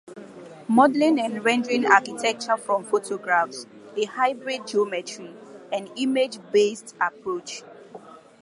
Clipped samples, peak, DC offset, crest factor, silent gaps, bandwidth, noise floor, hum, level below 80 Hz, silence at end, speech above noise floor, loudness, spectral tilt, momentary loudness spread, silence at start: under 0.1%; -2 dBFS; under 0.1%; 22 dB; none; 11.5 kHz; -45 dBFS; none; -78 dBFS; 0.25 s; 22 dB; -23 LUFS; -3.5 dB/octave; 21 LU; 0.1 s